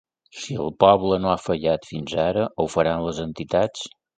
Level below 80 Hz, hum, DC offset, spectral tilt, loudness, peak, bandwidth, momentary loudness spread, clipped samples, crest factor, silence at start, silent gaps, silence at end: -48 dBFS; none; under 0.1%; -5.5 dB/octave; -22 LUFS; 0 dBFS; 9.2 kHz; 12 LU; under 0.1%; 22 dB; 0.35 s; none; 0.3 s